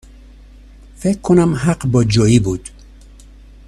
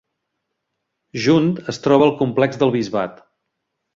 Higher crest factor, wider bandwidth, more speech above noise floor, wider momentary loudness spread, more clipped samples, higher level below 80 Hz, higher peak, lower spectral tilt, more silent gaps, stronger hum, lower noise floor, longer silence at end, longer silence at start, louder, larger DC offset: about the same, 18 dB vs 18 dB; first, 12.5 kHz vs 7.8 kHz; second, 26 dB vs 60 dB; about the same, 10 LU vs 10 LU; neither; first, -36 dBFS vs -58 dBFS; about the same, 0 dBFS vs -2 dBFS; about the same, -6.5 dB/octave vs -6.5 dB/octave; neither; first, 50 Hz at -35 dBFS vs none; second, -40 dBFS vs -77 dBFS; first, 1 s vs 0.8 s; second, 1 s vs 1.15 s; first, -15 LUFS vs -18 LUFS; neither